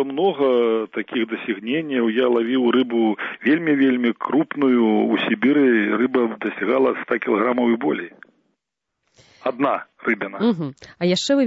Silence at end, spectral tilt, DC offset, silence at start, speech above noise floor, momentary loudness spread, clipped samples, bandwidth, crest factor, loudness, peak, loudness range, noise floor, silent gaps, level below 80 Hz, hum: 0 s; -5.5 dB/octave; under 0.1%; 0 s; 60 dB; 8 LU; under 0.1%; 8 kHz; 16 dB; -20 LUFS; -4 dBFS; 6 LU; -80 dBFS; none; -70 dBFS; none